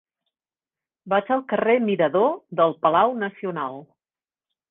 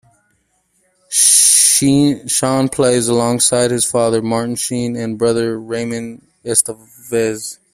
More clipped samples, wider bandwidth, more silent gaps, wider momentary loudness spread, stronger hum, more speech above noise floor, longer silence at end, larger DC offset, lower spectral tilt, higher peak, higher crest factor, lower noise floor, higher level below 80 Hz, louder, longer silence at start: neither; second, 4 kHz vs over 20 kHz; neither; second, 10 LU vs 14 LU; neither; first, over 69 dB vs 46 dB; first, 0.85 s vs 0.2 s; neither; first, -9 dB/octave vs -3 dB/octave; second, -4 dBFS vs 0 dBFS; about the same, 20 dB vs 16 dB; first, under -90 dBFS vs -62 dBFS; second, -66 dBFS vs -52 dBFS; second, -22 LUFS vs -13 LUFS; about the same, 1.05 s vs 1.1 s